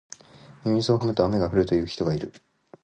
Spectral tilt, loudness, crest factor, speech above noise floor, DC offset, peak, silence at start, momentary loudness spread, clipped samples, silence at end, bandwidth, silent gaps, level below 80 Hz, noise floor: -7 dB/octave; -24 LUFS; 20 dB; 27 dB; under 0.1%; -6 dBFS; 0.65 s; 16 LU; under 0.1%; 0.55 s; 9.4 kHz; none; -48 dBFS; -50 dBFS